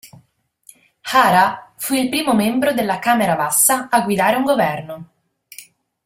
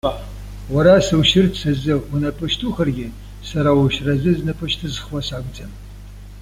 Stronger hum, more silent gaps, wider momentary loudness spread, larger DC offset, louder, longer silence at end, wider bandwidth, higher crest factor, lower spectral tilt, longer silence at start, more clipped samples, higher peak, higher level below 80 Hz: second, none vs 50 Hz at -35 dBFS; neither; second, 12 LU vs 22 LU; neither; about the same, -16 LUFS vs -18 LUFS; first, 0.4 s vs 0 s; about the same, 16.5 kHz vs 15.5 kHz; about the same, 18 dB vs 16 dB; second, -3 dB/octave vs -6 dB/octave; about the same, 0.05 s vs 0.05 s; neither; about the same, -2 dBFS vs -2 dBFS; second, -58 dBFS vs -34 dBFS